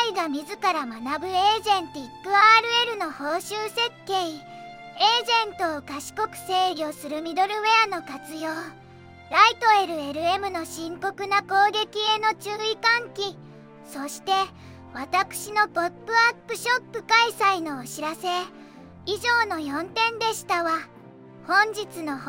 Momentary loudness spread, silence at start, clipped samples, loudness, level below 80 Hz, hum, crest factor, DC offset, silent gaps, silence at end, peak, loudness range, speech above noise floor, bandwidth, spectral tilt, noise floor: 14 LU; 0 s; under 0.1%; -23 LUFS; -68 dBFS; none; 22 dB; under 0.1%; none; 0 s; -2 dBFS; 4 LU; 22 dB; 17 kHz; -2 dB/octave; -47 dBFS